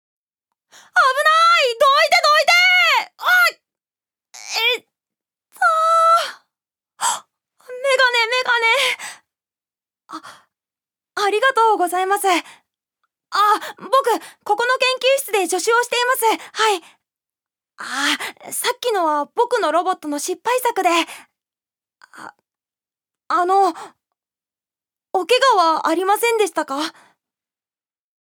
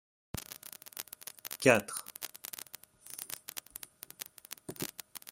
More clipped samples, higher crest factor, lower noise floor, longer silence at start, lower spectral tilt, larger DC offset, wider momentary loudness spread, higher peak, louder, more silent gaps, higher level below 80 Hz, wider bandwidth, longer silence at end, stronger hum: neither; second, 18 dB vs 30 dB; first, under -90 dBFS vs -54 dBFS; first, 0.95 s vs 0.35 s; second, 0.5 dB/octave vs -3.5 dB/octave; neither; second, 12 LU vs 19 LU; first, -2 dBFS vs -8 dBFS; first, -17 LUFS vs -36 LUFS; neither; second, -82 dBFS vs -68 dBFS; first, over 20 kHz vs 17 kHz; first, 1.45 s vs 0 s; neither